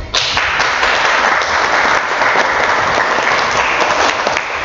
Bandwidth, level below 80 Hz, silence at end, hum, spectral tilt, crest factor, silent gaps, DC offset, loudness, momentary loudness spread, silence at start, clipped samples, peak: 8.2 kHz; -40 dBFS; 0 s; none; -1.5 dB/octave; 14 dB; none; under 0.1%; -12 LUFS; 2 LU; 0 s; under 0.1%; 0 dBFS